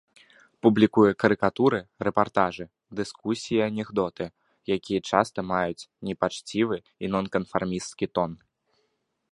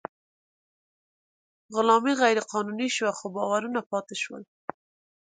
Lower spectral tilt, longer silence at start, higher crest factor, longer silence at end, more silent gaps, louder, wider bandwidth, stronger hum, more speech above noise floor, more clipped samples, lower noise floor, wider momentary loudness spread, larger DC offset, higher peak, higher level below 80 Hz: first, -6 dB/octave vs -3.5 dB/octave; second, 0.65 s vs 1.7 s; about the same, 24 dB vs 22 dB; first, 0.95 s vs 0.8 s; second, none vs 3.86-3.90 s; about the same, -26 LUFS vs -26 LUFS; first, 11.5 kHz vs 9.6 kHz; neither; second, 50 dB vs over 64 dB; neither; second, -75 dBFS vs under -90 dBFS; second, 13 LU vs 19 LU; neither; first, -2 dBFS vs -6 dBFS; first, -58 dBFS vs -80 dBFS